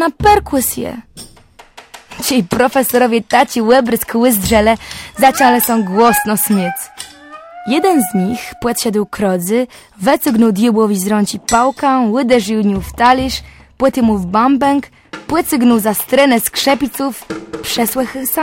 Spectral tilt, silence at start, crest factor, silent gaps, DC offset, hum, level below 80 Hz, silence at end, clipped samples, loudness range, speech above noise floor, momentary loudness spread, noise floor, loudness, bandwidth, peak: -4 dB/octave; 0 s; 14 dB; none; under 0.1%; none; -38 dBFS; 0 s; under 0.1%; 4 LU; 30 dB; 12 LU; -43 dBFS; -13 LUFS; 17 kHz; 0 dBFS